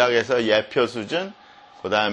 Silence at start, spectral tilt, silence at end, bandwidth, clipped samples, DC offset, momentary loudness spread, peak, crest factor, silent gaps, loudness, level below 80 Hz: 0 s; -4 dB/octave; 0 s; 9.8 kHz; under 0.1%; under 0.1%; 12 LU; -2 dBFS; 20 dB; none; -22 LUFS; -62 dBFS